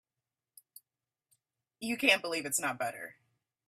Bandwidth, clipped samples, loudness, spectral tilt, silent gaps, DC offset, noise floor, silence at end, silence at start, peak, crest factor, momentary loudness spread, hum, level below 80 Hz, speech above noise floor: 15.5 kHz; under 0.1%; -31 LUFS; -1.5 dB/octave; none; under 0.1%; under -90 dBFS; 0.55 s; 1.8 s; -12 dBFS; 26 dB; 18 LU; none; -80 dBFS; over 58 dB